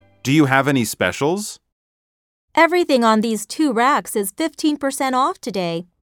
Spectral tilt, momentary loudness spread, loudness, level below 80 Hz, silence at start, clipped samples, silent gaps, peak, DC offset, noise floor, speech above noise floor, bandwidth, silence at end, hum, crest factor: -4.5 dB/octave; 9 LU; -18 LUFS; -62 dBFS; 0.25 s; under 0.1%; 1.72-2.48 s; 0 dBFS; under 0.1%; under -90 dBFS; over 72 dB; 18.5 kHz; 0.35 s; none; 18 dB